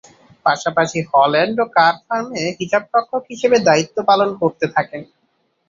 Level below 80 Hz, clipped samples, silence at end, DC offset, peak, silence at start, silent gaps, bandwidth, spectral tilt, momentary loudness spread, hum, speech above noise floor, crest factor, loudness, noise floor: -62 dBFS; under 0.1%; 0.65 s; under 0.1%; 0 dBFS; 0.45 s; none; 7.6 kHz; -4.5 dB/octave; 9 LU; none; 49 dB; 16 dB; -17 LUFS; -65 dBFS